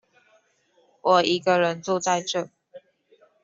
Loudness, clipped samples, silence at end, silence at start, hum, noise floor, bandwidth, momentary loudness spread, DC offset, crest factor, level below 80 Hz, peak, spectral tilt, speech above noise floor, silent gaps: -23 LUFS; under 0.1%; 0.65 s; 1.05 s; none; -64 dBFS; 7.8 kHz; 10 LU; under 0.1%; 20 dB; -72 dBFS; -6 dBFS; -3.5 dB/octave; 42 dB; none